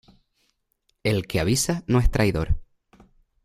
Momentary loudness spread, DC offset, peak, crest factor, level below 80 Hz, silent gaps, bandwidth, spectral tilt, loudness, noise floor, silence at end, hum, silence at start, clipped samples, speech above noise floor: 8 LU; under 0.1%; -6 dBFS; 18 dB; -32 dBFS; none; 15.5 kHz; -5 dB/octave; -24 LUFS; -72 dBFS; 0.8 s; none; 1.05 s; under 0.1%; 50 dB